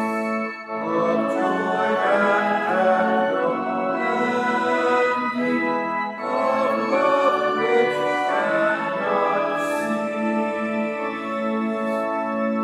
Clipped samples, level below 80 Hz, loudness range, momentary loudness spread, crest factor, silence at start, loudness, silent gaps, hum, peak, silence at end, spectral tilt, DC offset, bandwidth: under 0.1%; -74 dBFS; 3 LU; 6 LU; 16 dB; 0 s; -22 LUFS; none; none; -6 dBFS; 0 s; -5.5 dB/octave; under 0.1%; 13.5 kHz